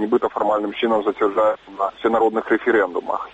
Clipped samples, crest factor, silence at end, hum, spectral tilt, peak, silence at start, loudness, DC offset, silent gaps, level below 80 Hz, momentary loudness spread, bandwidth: under 0.1%; 14 dB; 0.05 s; none; -6 dB/octave; -6 dBFS; 0 s; -20 LUFS; under 0.1%; none; -58 dBFS; 5 LU; 8 kHz